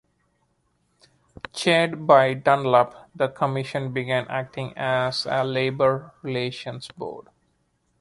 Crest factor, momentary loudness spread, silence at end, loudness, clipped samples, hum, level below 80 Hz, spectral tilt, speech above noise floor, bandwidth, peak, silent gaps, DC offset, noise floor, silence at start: 22 dB; 17 LU; 0.8 s; -23 LUFS; under 0.1%; none; -62 dBFS; -5.5 dB/octave; 46 dB; 11.5 kHz; -2 dBFS; none; under 0.1%; -69 dBFS; 1.55 s